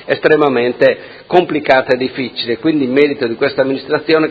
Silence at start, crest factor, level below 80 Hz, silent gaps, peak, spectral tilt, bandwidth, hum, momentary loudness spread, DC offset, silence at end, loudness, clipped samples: 0 s; 14 dB; -54 dBFS; none; 0 dBFS; -7.5 dB/octave; 7.2 kHz; none; 6 LU; under 0.1%; 0 s; -14 LUFS; 0.2%